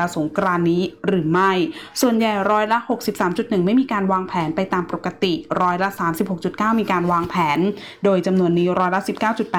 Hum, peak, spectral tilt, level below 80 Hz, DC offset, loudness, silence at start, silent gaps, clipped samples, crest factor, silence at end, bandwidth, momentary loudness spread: none; -8 dBFS; -6 dB/octave; -56 dBFS; 0.1%; -20 LUFS; 0 s; none; under 0.1%; 12 dB; 0 s; 18 kHz; 5 LU